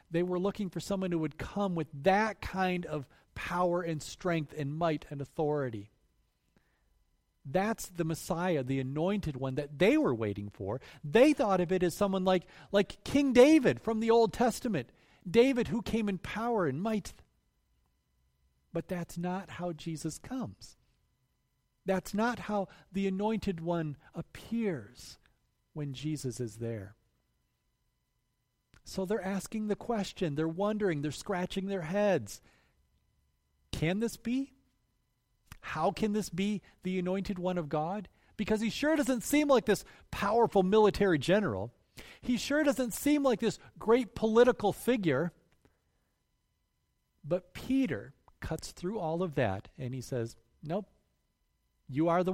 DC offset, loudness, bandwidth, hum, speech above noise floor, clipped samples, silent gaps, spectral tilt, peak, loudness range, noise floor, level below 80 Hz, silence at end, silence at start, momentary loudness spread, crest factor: under 0.1%; -32 LUFS; 16 kHz; none; 48 dB; under 0.1%; none; -6 dB/octave; -10 dBFS; 12 LU; -79 dBFS; -58 dBFS; 0 s; 0.1 s; 14 LU; 22 dB